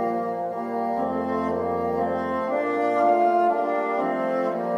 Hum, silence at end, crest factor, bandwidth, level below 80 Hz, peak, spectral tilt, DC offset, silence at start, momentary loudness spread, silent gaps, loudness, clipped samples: none; 0 s; 14 dB; 9.8 kHz; -60 dBFS; -10 dBFS; -7.5 dB/octave; under 0.1%; 0 s; 7 LU; none; -24 LUFS; under 0.1%